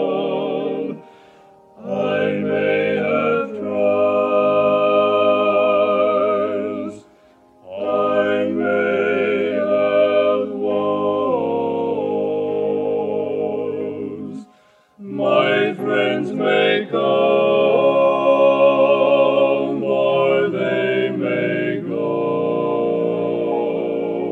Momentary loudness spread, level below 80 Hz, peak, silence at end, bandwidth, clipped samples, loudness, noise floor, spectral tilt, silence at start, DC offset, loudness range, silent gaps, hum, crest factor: 9 LU; -70 dBFS; -2 dBFS; 0 s; 7.8 kHz; under 0.1%; -18 LUFS; -54 dBFS; -7.5 dB/octave; 0 s; under 0.1%; 6 LU; none; none; 16 dB